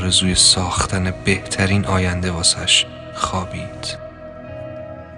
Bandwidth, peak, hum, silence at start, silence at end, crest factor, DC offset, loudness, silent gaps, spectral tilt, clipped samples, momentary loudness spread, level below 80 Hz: 12 kHz; 0 dBFS; none; 0 s; 0 s; 18 dB; under 0.1%; -17 LUFS; none; -3 dB/octave; under 0.1%; 20 LU; -38 dBFS